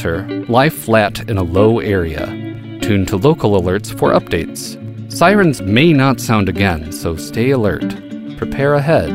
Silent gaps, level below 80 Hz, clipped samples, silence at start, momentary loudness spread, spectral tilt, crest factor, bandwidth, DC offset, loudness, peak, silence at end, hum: none; -36 dBFS; under 0.1%; 0 s; 13 LU; -6 dB/octave; 14 dB; 16 kHz; under 0.1%; -15 LUFS; 0 dBFS; 0 s; none